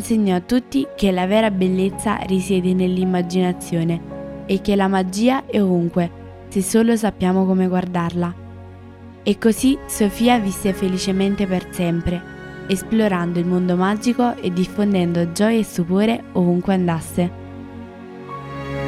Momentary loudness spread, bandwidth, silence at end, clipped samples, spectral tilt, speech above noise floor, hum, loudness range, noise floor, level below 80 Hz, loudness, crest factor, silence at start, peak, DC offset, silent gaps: 14 LU; 15 kHz; 0 s; under 0.1%; -6 dB/octave; 21 dB; none; 2 LU; -39 dBFS; -42 dBFS; -19 LUFS; 18 dB; 0 s; 0 dBFS; under 0.1%; none